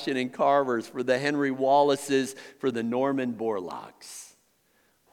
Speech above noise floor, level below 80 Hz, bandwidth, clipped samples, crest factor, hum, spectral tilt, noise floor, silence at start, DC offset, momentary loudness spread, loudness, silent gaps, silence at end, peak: 41 dB; -82 dBFS; 18 kHz; under 0.1%; 18 dB; none; -4.5 dB/octave; -67 dBFS; 0 s; under 0.1%; 18 LU; -26 LUFS; none; 0.85 s; -10 dBFS